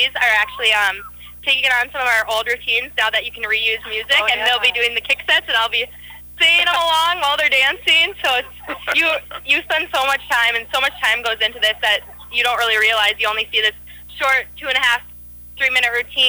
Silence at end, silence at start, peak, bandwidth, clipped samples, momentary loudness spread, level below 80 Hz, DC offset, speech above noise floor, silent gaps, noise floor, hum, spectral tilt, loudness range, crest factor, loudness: 0 s; 0 s; -4 dBFS; over 20 kHz; under 0.1%; 8 LU; -48 dBFS; under 0.1%; 20 dB; none; -38 dBFS; 60 Hz at -45 dBFS; 0 dB/octave; 2 LU; 14 dB; -16 LUFS